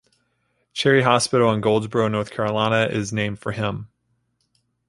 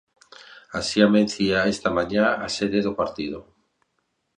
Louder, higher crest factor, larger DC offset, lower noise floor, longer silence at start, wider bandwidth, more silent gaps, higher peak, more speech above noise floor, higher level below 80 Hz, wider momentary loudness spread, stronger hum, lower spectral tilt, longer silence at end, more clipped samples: about the same, -20 LUFS vs -22 LUFS; about the same, 20 dB vs 22 dB; neither; second, -70 dBFS vs -74 dBFS; first, 0.75 s vs 0.5 s; first, 11.5 kHz vs 10 kHz; neither; about the same, -2 dBFS vs -2 dBFS; about the same, 50 dB vs 52 dB; about the same, -56 dBFS vs -52 dBFS; second, 9 LU vs 14 LU; first, 60 Hz at -50 dBFS vs none; about the same, -5 dB/octave vs -5 dB/octave; about the same, 1.05 s vs 0.95 s; neither